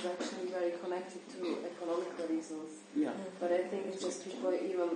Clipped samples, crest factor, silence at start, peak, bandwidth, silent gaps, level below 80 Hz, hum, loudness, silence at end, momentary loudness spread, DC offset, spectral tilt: under 0.1%; 16 dB; 0 s; -22 dBFS; 9.6 kHz; none; -88 dBFS; none; -38 LUFS; 0 s; 6 LU; under 0.1%; -4.5 dB/octave